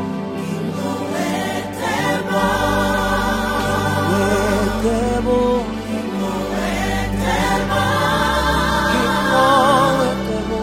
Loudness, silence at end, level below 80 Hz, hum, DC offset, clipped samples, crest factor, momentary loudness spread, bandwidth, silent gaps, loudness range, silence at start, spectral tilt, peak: -18 LUFS; 0 s; -32 dBFS; none; under 0.1%; under 0.1%; 16 dB; 8 LU; 16.5 kHz; none; 3 LU; 0 s; -5 dB/octave; -2 dBFS